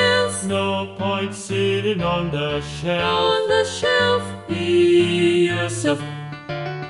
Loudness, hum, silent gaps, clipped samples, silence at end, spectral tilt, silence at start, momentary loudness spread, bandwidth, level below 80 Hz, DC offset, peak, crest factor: -20 LUFS; none; none; under 0.1%; 0 s; -4.5 dB/octave; 0 s; 9 LU; 11.5 kHz; -48 dBFS; under 0.1%; -6 dBFS; 14 dB